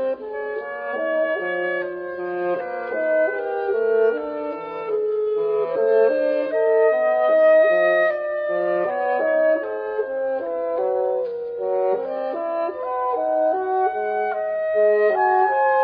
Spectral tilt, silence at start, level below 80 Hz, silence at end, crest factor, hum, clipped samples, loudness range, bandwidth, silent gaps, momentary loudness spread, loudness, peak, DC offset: -8 dB/octave; 0 s; -68 dBFS; 0 s; 14 dB; none; under 0.1%; 6 LU; 5 kHz; none; 9 LU; -21 LUFS; -8 dBFS; under 0.1%